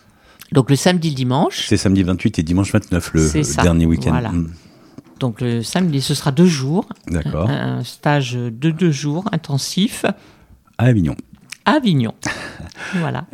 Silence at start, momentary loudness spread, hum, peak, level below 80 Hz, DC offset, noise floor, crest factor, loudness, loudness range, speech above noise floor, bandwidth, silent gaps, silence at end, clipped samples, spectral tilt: 0.5 s; 10 LU; none; 0 dBFS; -36 dBFS; under 0.1%; -46 dBFS; 18 dB; -18 LUFS; 3 LU; 28 dB; 15.5 kHz; none; 0.1 s; under 0.1%; -5.5 dB/octave